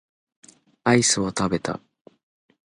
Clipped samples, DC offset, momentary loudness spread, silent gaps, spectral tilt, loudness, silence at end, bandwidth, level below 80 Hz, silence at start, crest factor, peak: under 0.1%; under 0.1%; 13 LU; none; -3.5 dB/octave; -22 LUFS; 0.95 s; 11.5 kHz; -56 dBFS; 0.85 s; 22 dB; -4 dBFS